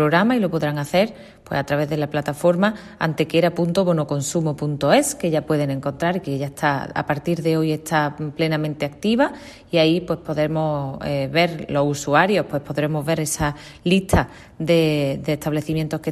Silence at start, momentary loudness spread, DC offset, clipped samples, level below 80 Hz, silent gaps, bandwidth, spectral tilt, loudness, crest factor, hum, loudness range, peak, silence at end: 0 s; 7 LU; under 0.1%; under 0.1%; -44 dBFS; none; 13.5 kHz; -5.5 dB/octave; -21 LUFS; 18 dB; none; 2 LU; -2 dBFS; 0 s